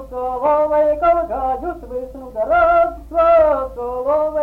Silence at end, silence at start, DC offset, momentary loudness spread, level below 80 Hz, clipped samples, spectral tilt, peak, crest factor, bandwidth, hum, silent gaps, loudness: 0 s; 0 s; under 0.1%; 13 LU; -38 dBFS; under 0.1%; -7.5 dB/octave; -4 dBFS; 12 dB; 4.7 kHz; none; none; -17 LUFS